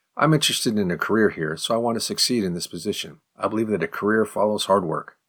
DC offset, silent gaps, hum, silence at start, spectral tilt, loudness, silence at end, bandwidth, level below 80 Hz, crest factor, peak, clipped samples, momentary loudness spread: under 0.1%; none; none; 0.15 s; -4 dB/octave; -22 LUFS; 0.25 s; 19.5 kHz; -62 dBFS; 18 dB; -4 dBFS; under 0.1%; 9 LU